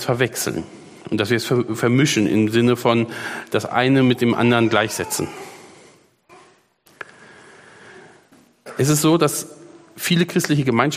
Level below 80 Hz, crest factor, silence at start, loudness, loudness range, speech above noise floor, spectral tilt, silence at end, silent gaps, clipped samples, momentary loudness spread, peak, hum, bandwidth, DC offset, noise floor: -58 dBFS; 20 dB; 0 s; -19 LUFS; 10 LU; 37 dB; -5 dB/octave; 0 s; none; under 0.1%; 20 LU; 0 dBFS; none; 15.5 kHz; under 0.1%; -55 dBFS